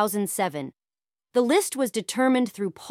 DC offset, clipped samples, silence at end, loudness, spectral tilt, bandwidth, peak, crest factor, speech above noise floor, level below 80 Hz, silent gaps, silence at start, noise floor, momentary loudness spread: under 0.1%; under 0.1%; 0 s; -25 LUFS; -4 dB/octave; 16.5 kHz; -10 dBFS; 16 dB; over 66 dB; -74 dBFS; none; 0 s; under -90 dBFS; 10 LU